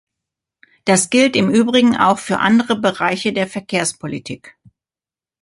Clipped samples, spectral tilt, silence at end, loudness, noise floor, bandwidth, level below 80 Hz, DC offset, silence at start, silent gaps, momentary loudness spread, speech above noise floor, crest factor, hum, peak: under 0.1%; -4 dB/octave; 0.9 s; -16 LUFS; under -90 dBFS; 11.5 kHz; -58 dBFS; under 0.1%; 0.85 s; none; 14 LU; over 74 dB; 16 dB; none; -2 dBFS